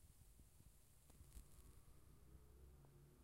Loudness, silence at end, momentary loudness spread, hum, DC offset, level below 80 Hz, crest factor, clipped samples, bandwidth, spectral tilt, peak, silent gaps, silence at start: -68 LUFS; 0 s; 4 LU; none; under 0.1%; -68 dBFS; 22 dB; under 0.1%; 16 kHz; -5 dB/octave; -44 dBFS; none; 0 s